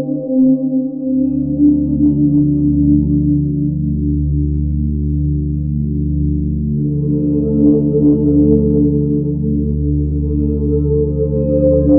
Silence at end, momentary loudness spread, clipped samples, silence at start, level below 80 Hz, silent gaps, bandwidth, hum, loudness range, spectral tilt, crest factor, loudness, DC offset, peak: 0 s; 6 LU; under 0.1%; 0 s; -22 dBFS; none; 1.3 kHz; none; 4 LU; -18 dB/octave; 12 dB; -15 LUFS; under 0.1%; 0 dBFS